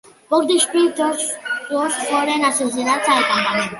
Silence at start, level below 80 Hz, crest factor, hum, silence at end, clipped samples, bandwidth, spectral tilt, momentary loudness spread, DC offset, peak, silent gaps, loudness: 0.3 s; -66 dBFS; 16 dB; none; 0 s; under 0.1%; 12 kHz; -2 dB/octave; 6 LU; under 0.1%; -4 dBFS; none; -18 LUFS